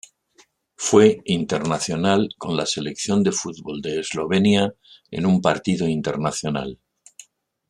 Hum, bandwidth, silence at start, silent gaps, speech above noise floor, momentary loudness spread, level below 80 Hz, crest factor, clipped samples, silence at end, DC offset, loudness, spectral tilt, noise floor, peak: none; 11.5 kHz; 0.8 s; none; 38 dB; 10 LU; -56 dBFS; 20 dB; under 0.1%; 0.95 s; under 0.1%; -21 LUFS; -5 dB/octave; -58 dBFS; -2 dBFS